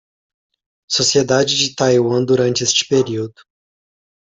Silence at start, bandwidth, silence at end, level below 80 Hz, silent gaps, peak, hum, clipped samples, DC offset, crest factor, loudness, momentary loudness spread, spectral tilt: 0.9 s; 8.4 kHz; 1.05 s; -56 dBFS; none; -2 dBFS; none; under 0.1%; under 0.1%; 16 dB; -15 LUFS; 7 LU; -3.5 dB/octave